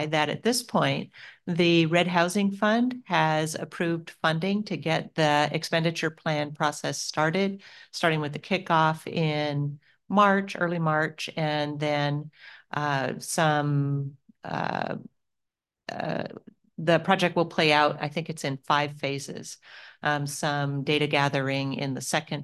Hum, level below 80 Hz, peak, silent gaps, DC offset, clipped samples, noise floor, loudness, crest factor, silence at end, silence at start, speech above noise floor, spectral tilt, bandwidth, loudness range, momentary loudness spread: none; -72 dBFS; -4 dBFS; none; under 0.1%; under 0.1%; -85 dBFS; -26 LUFS; 22 dB; 0 s; 0 s; 59 dB; -5 dB/octave; 12.5 kHz; 4 LU; 12 LU